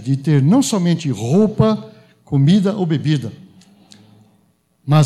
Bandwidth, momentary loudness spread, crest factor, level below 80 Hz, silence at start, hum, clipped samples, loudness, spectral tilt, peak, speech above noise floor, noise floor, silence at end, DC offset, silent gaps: 13 kHz; 8 LU; 14 dB; -50 dBFS; 0 s; none; under 0.1%; -16 LUFS; -7 dB/octave; -2 dBFS; 44 dB; -59 dBFS; 0 s; under 0.1%; none